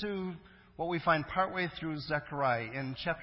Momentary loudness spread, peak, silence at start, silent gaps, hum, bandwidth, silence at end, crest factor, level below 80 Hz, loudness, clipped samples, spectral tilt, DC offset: 9 LU; -14 dBFS; 0 s; none; none; 5.8 kHz; 0 s; 20 dB; -60 dBFS; -34 LUFS; under 0.1%; -9.5 dB/octave; under 0.1%